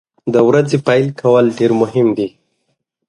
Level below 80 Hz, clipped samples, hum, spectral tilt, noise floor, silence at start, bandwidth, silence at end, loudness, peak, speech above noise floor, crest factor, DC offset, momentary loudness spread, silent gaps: -58 dBFS; under 0.1%; none; -7 dB/octave; -68 dBFS; 0.25 s; 11 kHz; 0.8 s; -14 LUFS; 0 dBFS; 56 dB; 14 dB; under 0.1%; 5 LU; none